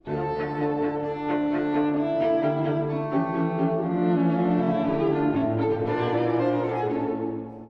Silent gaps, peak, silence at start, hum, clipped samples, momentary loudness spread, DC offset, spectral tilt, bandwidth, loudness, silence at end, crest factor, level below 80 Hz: none; -12 dBFS; 0.05 s; none; under 0.1%; 5 LU; under 0.1%; -10 dB/octave; 5.6 kHz; -25 LUFS; 0 s; 12 dB; -56 dBFS